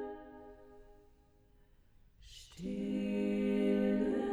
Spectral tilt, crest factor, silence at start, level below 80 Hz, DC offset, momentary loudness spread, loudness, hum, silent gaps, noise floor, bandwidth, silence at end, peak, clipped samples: -7.5 dB/octave; 16 dB; 0 s; -60 dBFS; under 0.1%; 23 LU; -35 LUFS; none; none; -65 dBFS; 10.5 kHz; 0 s; -22 dBFS; under 0.1%